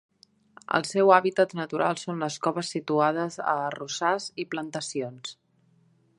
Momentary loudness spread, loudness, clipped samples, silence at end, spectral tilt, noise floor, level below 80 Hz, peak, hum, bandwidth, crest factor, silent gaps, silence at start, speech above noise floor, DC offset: 13 LU; -26 LUFS; under 0.1%; 0.85 s; -4.5 dB/octave; -64 dBFS; -78 dBFS; -4 dBFS; none; 11.5 kHz; 24 dB; none; 0.7 s; 38 dB; under 0.1%